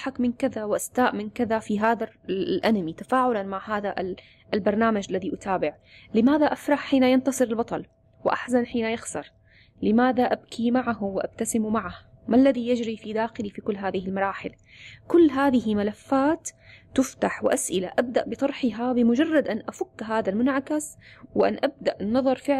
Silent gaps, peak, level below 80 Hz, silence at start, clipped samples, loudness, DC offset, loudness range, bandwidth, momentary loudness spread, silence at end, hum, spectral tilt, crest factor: none; -10 dBFS; -58 dBFS; 0 s; under 0.1%; -25 LUFS; under 0.1%; 2 LU; 14 kHz; 10 LU; 0 s; none; -5 dB/octave; 14 dB